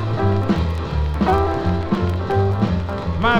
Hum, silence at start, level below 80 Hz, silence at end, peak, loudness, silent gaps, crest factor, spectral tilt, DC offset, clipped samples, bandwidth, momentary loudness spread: none; 0 s; -28 dBFS; 0 s; -2 dBFS; -20 LUFS; none; 16 dB; -8 dB/octave; under 0.1%; under 0.1%; 8 kHz; 5 LU